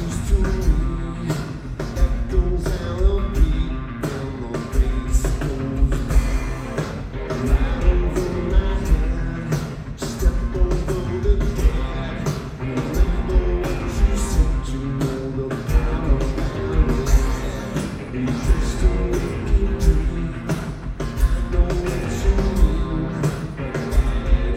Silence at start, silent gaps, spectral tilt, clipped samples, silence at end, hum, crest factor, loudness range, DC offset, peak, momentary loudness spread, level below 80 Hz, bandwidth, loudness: 0 s; none; -6.5 dB/octave; under 0.1%; 0 s; none; 16 dB; 1 LU; under 0.1%; -4 dBFS; 6 LU; -20 dBFS; 14.5 kHz; -23 LUFS